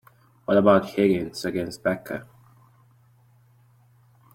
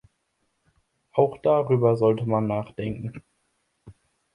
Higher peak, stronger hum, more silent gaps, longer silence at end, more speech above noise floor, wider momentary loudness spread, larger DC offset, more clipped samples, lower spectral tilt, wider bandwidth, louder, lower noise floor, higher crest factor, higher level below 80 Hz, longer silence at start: about the same, -4 dBFS vs -6 dBFS; neither; neither; first, 2.1 s vs 0.45 s; second, 36 dB vs 51 dB; first, 18 LU vs 12 LU; neither; neither; second, -6.5 dB/octave vs -10 dB/octave; first, 16.5 kHz vs 10.5 kHz; about the same, -23 LUFS vs -24 LUFS; second, -58 dBFS vs -74 dBFS; about the same, 22 dB vs 20 dB; about the same, -60 dBFS vs -58 dBFS; second, 0.5 s vs 1.15 s